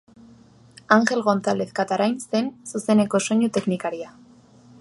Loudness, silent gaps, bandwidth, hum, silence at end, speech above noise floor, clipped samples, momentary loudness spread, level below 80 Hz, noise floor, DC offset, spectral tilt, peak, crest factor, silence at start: -22 LUFS; none; 11.5 kHz; none; 0.7 s; 29 dB; under 0.1%; 11 LU; -66 dBFS; -51 dBFS; under 0.1%; -5 dB/octave; -2 dBFS; 22 dB; 0.9 s